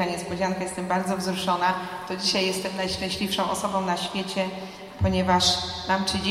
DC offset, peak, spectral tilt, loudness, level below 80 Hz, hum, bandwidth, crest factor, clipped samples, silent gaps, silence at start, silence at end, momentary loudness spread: under 0.1%; -8 dBFS; -4 dB/octave; -25 LUFS; -48 dBFS; none; 15 kHz; 18 dB; under 0.1%; none; 0 s; 0 s; 7 LU